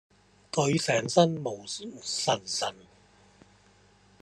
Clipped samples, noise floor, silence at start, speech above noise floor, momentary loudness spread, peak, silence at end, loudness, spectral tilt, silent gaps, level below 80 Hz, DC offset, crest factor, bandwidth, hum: under 0.1%; -60 dBFS; 0.55 s; 33 dB; 12 LU; -6 dBFS; 1.5 s; -28 LUFS; -4 dB/octave; none; -68 dBFS; under 0.1%; 24 dB; 12.5 kHz; none